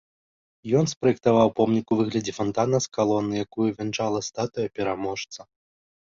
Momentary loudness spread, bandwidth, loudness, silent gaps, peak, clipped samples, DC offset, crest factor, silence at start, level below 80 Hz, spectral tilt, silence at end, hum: 9 LU; 7.6 kHz; -24 LUFS; 0.97-1.01 s; -6 dBFS; under 0.1%; under 0.1%; 20 dB; 0.65 s; -58 dBFS; -5.5 dB/octave; 0.75 s; none